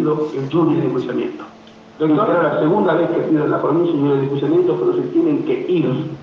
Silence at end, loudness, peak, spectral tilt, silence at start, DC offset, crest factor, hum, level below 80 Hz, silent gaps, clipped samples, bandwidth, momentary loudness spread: 0 s; -17 LUFS; -4 dBFS; -9 dB/octave; 0 s; under 0.1%; 12 dB; none; -62 dBFS; none; under 0.1%; 6.4 kHz; 6 LU